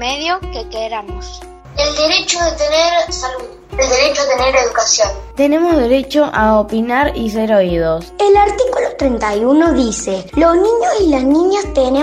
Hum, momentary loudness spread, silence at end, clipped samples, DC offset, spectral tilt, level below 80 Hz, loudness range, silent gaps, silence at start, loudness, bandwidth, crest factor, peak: none; 11 LU; 0 s; under 0.1%; under 0.1%; -3.5 dB/octave; -32 dBFS; 3 LU; none; 0 s; -13 LUFS; 14.5 kHz; 14 dB; 0 dBFS